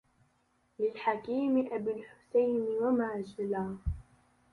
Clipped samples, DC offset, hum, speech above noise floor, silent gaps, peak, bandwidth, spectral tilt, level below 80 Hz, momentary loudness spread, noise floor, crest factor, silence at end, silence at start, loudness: under 0.1%; under 0.1%; none; 41 dB; none; -18 dBFS; 10.5 kHz; -8.5 dB/octave; -50 dBFS; 9 LU; -73 dBFS; 16 dB; 0.5 s; 0.8 s; -33 LUFS